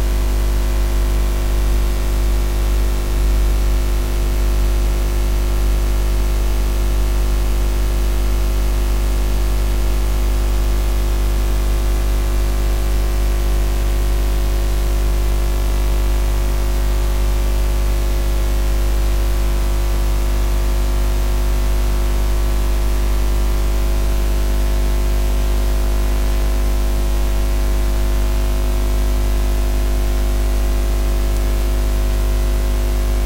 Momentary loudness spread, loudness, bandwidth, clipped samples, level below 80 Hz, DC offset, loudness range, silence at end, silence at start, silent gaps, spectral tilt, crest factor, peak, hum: 1 LU; -20 LUFS; 16 kHz; under 0.1%; -16 dBFS; under 0.1%; 0 LU; 0 s; 0 s; none; -5.5 dB/octave; 10 dB; -6 dBFS; 50 Hz at -15 dBFS